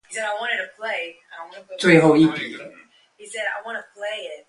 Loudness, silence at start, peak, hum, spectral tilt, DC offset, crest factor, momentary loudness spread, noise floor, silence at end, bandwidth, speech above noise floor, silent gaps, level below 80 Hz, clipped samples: -21 LUFS; 0.1 s; -2 dBFS; none; -5.5 dB/octave; under 0.1%; 20 dB; 24 LU; -51 dBFS; 0.1 s; 11.5 kHz; 32 dB; none; -60 dBFS; under 0.1%